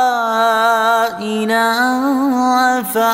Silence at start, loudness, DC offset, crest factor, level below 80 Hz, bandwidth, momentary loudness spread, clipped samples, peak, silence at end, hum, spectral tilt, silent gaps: 0 s; -14 LUFS; under 0.1%; 12 dB; -60 dBFS; 16.5 kHz; 3 LU; under 0.1%; -2 dBFS; 0 s; none; -3.5 dB/octave; none